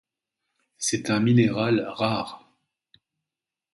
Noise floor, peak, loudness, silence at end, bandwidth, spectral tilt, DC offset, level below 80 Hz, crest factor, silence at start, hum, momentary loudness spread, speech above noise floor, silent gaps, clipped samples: -89 dBFS; -8 dBFS; -24 LUFS; 1.35 s; 11.5 kHz; -5 dB/octave; under 0.1%; -62 dBFS; 20 dB; 0.8 s; none; 9 LU; 66 dB; none; under 0.1%